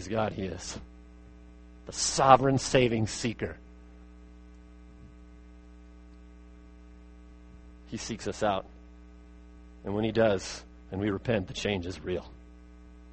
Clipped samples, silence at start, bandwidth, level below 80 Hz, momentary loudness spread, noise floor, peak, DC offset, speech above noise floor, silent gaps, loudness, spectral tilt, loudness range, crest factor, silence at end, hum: under 0.1%; 0 s; 8.8 kHz; -50 dBFS; 20 LU; -51 dBFS; -4 dBFS; under 0.1%; 22 dB; none; -29 LUFS; -4.5 dB/octave; 13 LU; 28 dB; 0 s; none